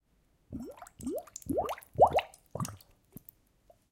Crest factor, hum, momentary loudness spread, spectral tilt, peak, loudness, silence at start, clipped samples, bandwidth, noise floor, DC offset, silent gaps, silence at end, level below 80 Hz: 24 dB; none; 23 LU; -5.5 dB/octave; -10 dBFS; -32 LUFS; 0.5 s; under 0.1%; 17 kHz; -70 dBFS; under 0.1%; none; 1.15 s; -60 dBFS